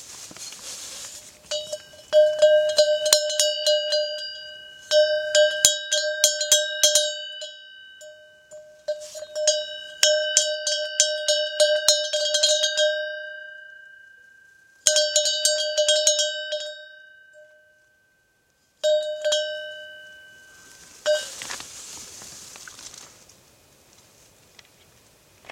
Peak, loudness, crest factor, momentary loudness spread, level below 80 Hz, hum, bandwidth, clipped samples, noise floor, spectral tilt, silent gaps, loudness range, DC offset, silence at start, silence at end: 0 dBFS; -21 LUFS; 24 dB; 21 LU; -70 dBFS; none; 16.5 kHz; under 0.1%; -65 dBFS; 2.5 dB/octave; none; 13 LU; under 0.1%; 0 s; 2.45 s